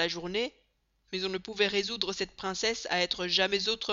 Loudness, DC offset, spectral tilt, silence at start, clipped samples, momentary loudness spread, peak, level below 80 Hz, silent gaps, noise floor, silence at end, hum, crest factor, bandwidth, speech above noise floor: -30 LUFS; under 0.1%; -1 dB/octave; 0 s; under 0.1%; 8 LU; -10 dBFS; -62 dBFS; none; -72 dBFS; 0 s; none; 22 dB; 7.6 kHz; 41 dB